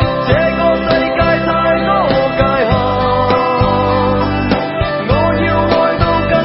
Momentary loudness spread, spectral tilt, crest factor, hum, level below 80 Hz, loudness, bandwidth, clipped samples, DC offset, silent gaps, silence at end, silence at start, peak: 2 LU; -10.5 dB/octave; 12 dB; none; -28 dBFS; -13 LUFS; 5.8 kHz; under 0.1%; under 0.1%; none; 0 s; 0 s; 0 dBFS